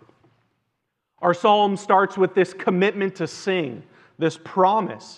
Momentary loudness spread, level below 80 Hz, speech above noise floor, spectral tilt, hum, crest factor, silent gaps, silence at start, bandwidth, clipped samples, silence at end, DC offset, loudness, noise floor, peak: 8 LU; -78 dBFS; 56 dB; -5.5 dB/octave; none; 18 dB; none; 1.2 s; 10 kHz; under 0.1%; 0.05 s; under 0.1%; -21 LUFS; -77 dBFS; -4 dBFS